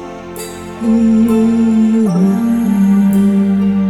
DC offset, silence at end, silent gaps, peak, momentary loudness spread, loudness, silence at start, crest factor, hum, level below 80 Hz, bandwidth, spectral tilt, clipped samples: under 0.1%; 0 s; none; -2 dBFS; 15 LU; -12 LUFS; 0 s; 8 dB; none; -44 dBFS; 14 kHz; -8 dB/octave; under 0.1%